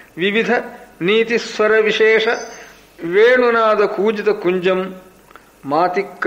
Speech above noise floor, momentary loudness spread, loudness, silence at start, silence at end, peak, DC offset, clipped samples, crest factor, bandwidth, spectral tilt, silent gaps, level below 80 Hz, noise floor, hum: 30 dB; 11 LU; -16 LUFS; 0.15 s; 0 s; -4 dBFS; under 0.1%; under 0.1%; 14 dB; 15 kHz; -4.5 dB/octave; none; -58 dBFS; -45 dBFS; none